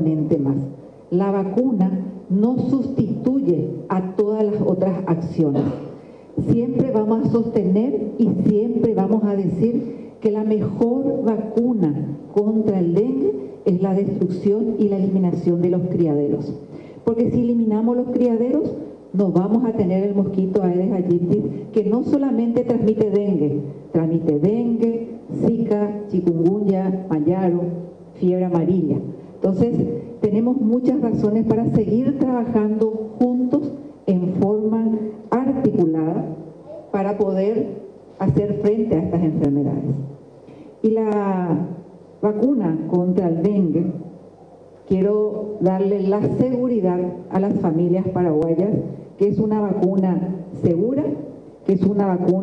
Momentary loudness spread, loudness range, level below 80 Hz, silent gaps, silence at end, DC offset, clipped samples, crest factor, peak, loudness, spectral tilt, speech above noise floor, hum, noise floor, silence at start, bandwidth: 7 LU; 2 LU; -54 dBFS; none; 0 s; under 0.1%; under 0.1%; 16 dB; -4 dBFS; -20 LUFS; -11 dB/octave; 26 dB; none; -45 dBFS; 0 s; 6 kHz